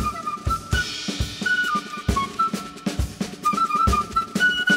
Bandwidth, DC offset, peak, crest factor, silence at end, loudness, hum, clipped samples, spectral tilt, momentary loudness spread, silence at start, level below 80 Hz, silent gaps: 16 kHz; under 0.1%; -6 dBFS; 16 dB; 0 s; -23 LUFS; none; under 0.1%; -4 dB/octave; 8 LU; 0 s; -34 dBFS; none